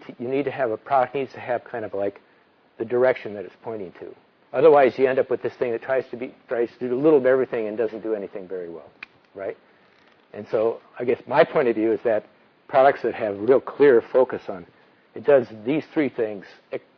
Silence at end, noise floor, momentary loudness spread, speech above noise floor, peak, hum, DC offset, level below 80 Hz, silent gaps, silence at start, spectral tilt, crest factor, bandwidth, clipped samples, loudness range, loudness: 0.2 s; -58 dBFS; 19 LU; 36 dB; -2 dBFS; none; under 0.1%; -70 dBFS; none; 0.1 s; -8.5 dB/octave; 20 dB; 5.4 kHz; under 0.1%; 7 LU; -22 LUFS